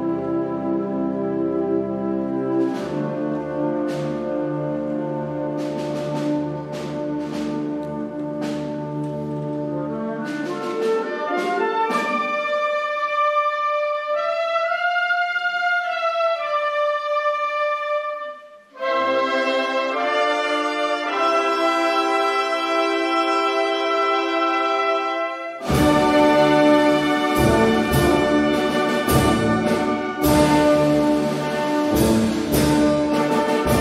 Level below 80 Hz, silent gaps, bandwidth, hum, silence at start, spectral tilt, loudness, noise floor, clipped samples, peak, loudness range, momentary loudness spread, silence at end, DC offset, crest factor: -42 dBFS; none; 16 kHz; none; 0 s; -5.5 dB/octave; -21 LUFS; -40 dBFS; under 0.1%; -4 dBFS; 8 LU; 10 LU; 0 s; under 0.1%; 16 dB